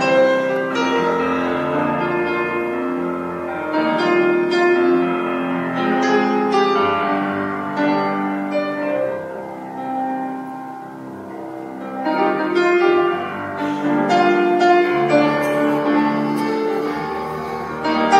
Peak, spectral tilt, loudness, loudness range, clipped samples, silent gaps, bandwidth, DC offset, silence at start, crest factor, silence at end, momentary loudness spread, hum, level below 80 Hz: -2 dBFS; -6 dB/octave; -19 LUFS; 7 LU; under 0.1%; none; 13 kHz; under 0.1%; 0 s; 16 dB; 0 s; 12 LU; none; -58 dBFS